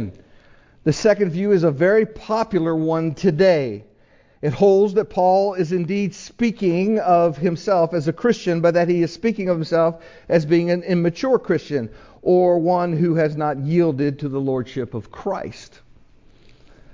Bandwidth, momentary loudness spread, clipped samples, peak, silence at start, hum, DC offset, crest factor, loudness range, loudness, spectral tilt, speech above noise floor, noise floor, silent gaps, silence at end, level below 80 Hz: 7.6 kHz; 10 LU; under 0.1%; -4 dBFS; 0 s; none; under 0.1%; 16 dB; 2 LU; -19 LUFS; -7.5 dB/octave; 35 dB; -54 dBFS; none; 1.3 s; -54 dBFS